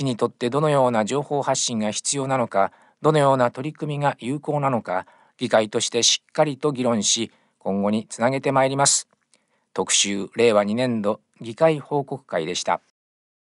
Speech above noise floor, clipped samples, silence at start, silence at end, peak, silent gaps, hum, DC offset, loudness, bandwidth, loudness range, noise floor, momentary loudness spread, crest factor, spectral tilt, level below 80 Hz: 43 dB; under 0.1%; 0 s; 0.75 s; -4 dBFS; none; none; under 0.1%; -22 LUFS; 11.5 kHz; 2 LU; -65 dBFS; 10 LU; 18 dB; -3.5 dB/octave; -72 dBFS